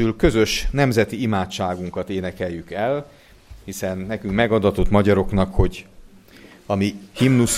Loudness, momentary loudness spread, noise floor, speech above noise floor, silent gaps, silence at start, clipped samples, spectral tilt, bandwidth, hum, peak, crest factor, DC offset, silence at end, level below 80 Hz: -21 LUFS; 10 LU; -46 dBFS; 26 dB; none; 0 s; under 0.1%; -5.5 dB/octave; 15.5 kHz; none; -2 dBFS; 18 dB; under 0.1%; 0 s; -32 dBFS